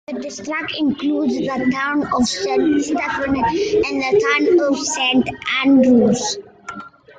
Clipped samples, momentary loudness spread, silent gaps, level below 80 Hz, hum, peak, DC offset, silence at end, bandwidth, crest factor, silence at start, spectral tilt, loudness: under 0.1%; 12 LU; none; -50 dBFS; none; -4 dBFS; under 0.1%; 0.3 s; 9.4 kHz; 14 dB; 0.1 s; -4 dB/octave; -17 LUFS